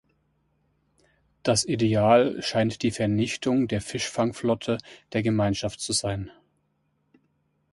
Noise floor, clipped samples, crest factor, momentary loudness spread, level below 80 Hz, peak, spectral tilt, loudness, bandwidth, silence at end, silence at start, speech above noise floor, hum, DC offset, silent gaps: -72 dBFS; under 0.1%; 20 dB; 11 LU; -54 dBFS; -6 dBFS; -5 dB/octave; -25 LUFS; 11.5 kHz; 1.4 s; 1.45 s; 47 dB; none; under 0.1%; none